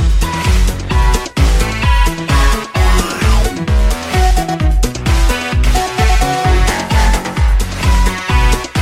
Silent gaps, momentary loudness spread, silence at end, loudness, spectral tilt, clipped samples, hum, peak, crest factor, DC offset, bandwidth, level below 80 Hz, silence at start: none; 2 LU; 0 s; -14 LUFS; -4.5 dB/octave; under 0.1%; none; 0 dBFS; 10 dB; under 0.1%; 15.5 kHz; -12 dBFS; 0 s